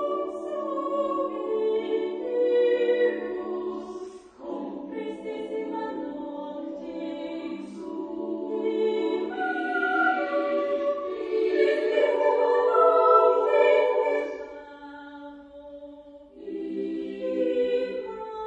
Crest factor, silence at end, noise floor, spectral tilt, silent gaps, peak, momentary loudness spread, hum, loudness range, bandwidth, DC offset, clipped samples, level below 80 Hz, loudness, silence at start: 20 dB; 0 s; -47 dBFS; -5.5 dB/octave; none; -6 dBFS; 19 LU; none; 13 LU; 8 kHz; under 0.1%; under 0.1%; -68 dBFS; -26 LUFS; 0 s